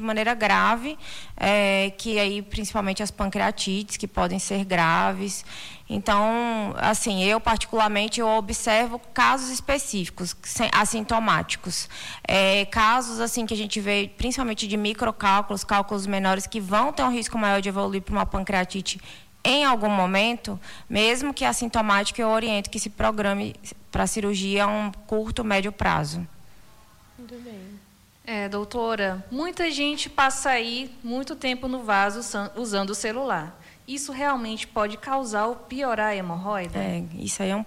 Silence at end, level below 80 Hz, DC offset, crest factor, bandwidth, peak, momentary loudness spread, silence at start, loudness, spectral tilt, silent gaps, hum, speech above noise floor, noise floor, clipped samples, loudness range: 0 s; -44 dBFS; under 0.1%; 16 dB; 16 kHz; -8 dBFS; 11 LU; 0 s; -24 LUFS; -3.5 dB/octave; none; none; 29 dB; -54 dBFS; under 0.1%; 5 LU